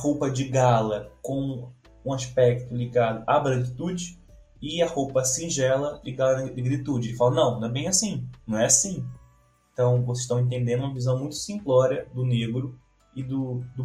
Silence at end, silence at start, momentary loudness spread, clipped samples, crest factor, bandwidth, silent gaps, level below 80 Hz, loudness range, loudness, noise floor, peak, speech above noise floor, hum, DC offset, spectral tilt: 0 s; 0 s; 11 LU; under 0.1%; 20 dB; 14 kHz; none; -54 dBFS; 2 LU; -25 LUFS; -60 dBFS; -4 dBFS; 36 dB; none; under 0.1%; -5 dB/octave